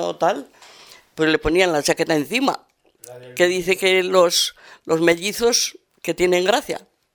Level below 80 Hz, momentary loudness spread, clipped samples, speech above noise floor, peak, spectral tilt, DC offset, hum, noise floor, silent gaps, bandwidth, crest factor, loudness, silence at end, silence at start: -48 dBFS; 15 LU; under 0.1%; 27 dB; -2 dBFS; -3 dB/octave; under 0.1%; none; -47 dBFS; none; over 20 kHz; 18 dB; -19 LUFS; 0.35 s; 0 s